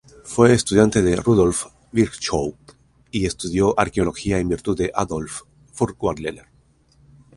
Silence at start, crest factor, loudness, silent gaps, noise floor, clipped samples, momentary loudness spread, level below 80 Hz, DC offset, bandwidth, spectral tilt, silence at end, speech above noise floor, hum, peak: 0.25 s; 20 dB; -20 LUFS; none; -57 dBFS; under 0.1%; 13 LU; -40 dBFS; under 0.1%; 11.5 kHz; -5.5 dB/octave; 1 s; 38 dB; none; 0 dBFS